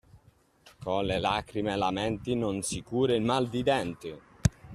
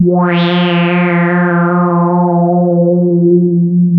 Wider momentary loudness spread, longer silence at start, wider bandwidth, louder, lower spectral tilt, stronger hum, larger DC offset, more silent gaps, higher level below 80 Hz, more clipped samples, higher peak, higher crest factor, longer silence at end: first, 7 LU vs 1 LU; first, 0.15 s vs 0 s; first, 14 kHz vs 4.7 kHz; second, -29 LUFS vs -11 LUFS; second, -5 dB/octave vs -10.5 dB/octave; neither; neither; neither; first, -50 dBFS vs -58 dBFS; neither; second, -10 dBFS vs 0 dBFS; first, 20 dB vs 10 dB; about the same, 0 s vs 0 s